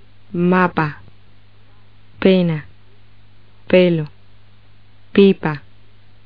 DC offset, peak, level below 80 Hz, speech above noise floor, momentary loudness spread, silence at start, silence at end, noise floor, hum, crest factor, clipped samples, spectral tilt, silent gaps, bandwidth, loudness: 1%; 0 dBFS; -52 dBFS; 35 dB; 15 LU; 0.35 s; 0.65 s; -50 dBFS; 50 Hz at -45 dBFS; 18 dB; under 0.1%; -6 dB/octave; none; 5 kHz; -17 LUFS